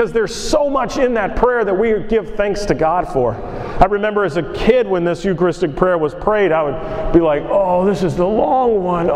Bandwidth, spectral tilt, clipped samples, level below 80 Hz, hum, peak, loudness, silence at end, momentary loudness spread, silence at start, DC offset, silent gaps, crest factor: 13 kHz; -6 dB/octave; under 0.1%; -32 dBFS; none; 0 dBFS; -16 LUFS; 0 s; 5 LU; 0 s; under 0.1%; none; 16 dB